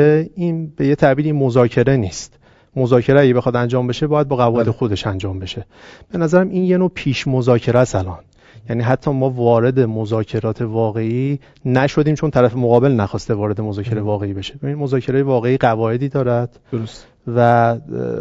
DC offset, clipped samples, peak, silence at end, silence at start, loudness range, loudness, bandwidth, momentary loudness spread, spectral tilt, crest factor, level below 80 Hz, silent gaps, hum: under 0.1%; under 0.1%; 0 dBFS; 0 s; 0 s; 3 LU; -17 LUFS; 7.8 kHz; 11 LU; -7.5 dB/octave; 16 dB; -44 dBFS; none; none